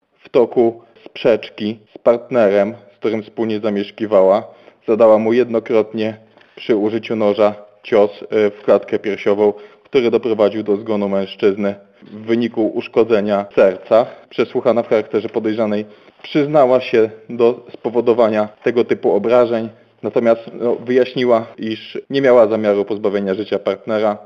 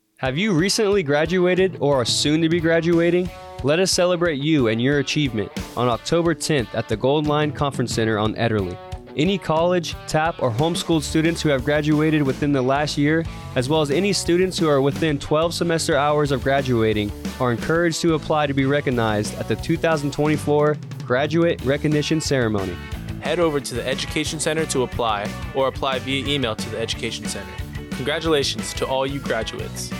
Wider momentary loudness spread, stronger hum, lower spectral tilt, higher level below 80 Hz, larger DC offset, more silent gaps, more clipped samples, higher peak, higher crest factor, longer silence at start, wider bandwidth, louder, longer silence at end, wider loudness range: first, 10 LU vs 7 LU; neither; first, -7.5 dB/octave vs -5 dB/octave; second, -62 dBFS vs -42 dBFS; neither; neither; neither; first, -2 dBFS vs -10 dBFS; about the same, 14 dB vs 12 dB; first, 0.35 s vs 0.2 s; second, 6.8 kHz vs 17 kHz; first, -16 LUFS vs -21 LUFS; about the same, 0.05 s vs 0 s; about the same, 2 LU vs 4 LU